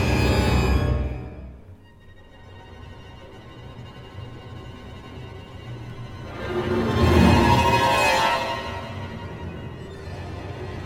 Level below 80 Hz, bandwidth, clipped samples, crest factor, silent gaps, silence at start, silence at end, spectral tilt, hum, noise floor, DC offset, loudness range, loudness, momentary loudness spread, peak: -32 dBFS; 16.5 kHz; under 0.1%; 20 dB; none; 0 s; 0 s; -5.5 dB/octave; none; -47 dBFS; under 0.1%; 21 LU; -21 LUFS; 25 LU; -4 dBFS